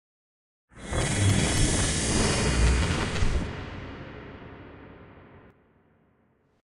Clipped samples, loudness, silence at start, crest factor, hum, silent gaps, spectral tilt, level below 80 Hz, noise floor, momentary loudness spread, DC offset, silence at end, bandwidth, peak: under 0.1%; -26 LUFS; 0.75 s; 18 dB; none; none; -4 dB/octave; -34 dBFS; -66 dBFS; 21 LU; under 0.1%; 1.35 s; 13 kHz; -10 dBFS